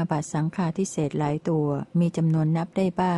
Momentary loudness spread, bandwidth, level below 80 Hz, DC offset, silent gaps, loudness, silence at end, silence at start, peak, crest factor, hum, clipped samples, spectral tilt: 4 LU; 11.5 kHz; -58 dBFS; under 0.1%; none; -25 LUFS; 0 s; 0 s; -12 dBFS; 12 dB; none; under 0.1%; -7.5 dB/octave